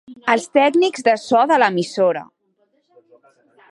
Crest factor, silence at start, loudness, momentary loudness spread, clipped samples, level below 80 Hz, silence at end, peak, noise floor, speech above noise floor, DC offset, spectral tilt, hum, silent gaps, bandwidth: 18 dB; 0.1 s; -17 LUFS; 5 LU; under 0.1%; -70 dBFS; 1.45 s; -2 dBFS; -64 dBFS; 48 dB; under 0.1%; -4.5 dB/octave; none; none; 11.5 kHz